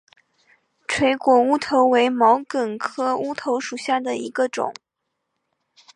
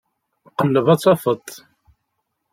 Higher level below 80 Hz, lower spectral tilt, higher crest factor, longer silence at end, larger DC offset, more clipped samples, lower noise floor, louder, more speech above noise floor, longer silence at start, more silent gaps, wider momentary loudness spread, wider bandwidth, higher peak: about the same, -62 dBFS vs -64 dBFS; second, -4 dB/octave vs -6.5 dB/octave; about the same, 18 dB vs 18 dB; first, 1.25 s vs 0.95 s; neither; neither; about the same, -78 dBFS vs -75 dBFS; about the same, -20 LUFS vs -18 LUFS; about the same, 58 dB vs 58 dB; first, 0.9 s vs 0.6 s; neither; second, 10 LU vs 15 LU; second, 11 kHz vs 16.5 kHz; about the same, -4 dBFS vs -2 dBFS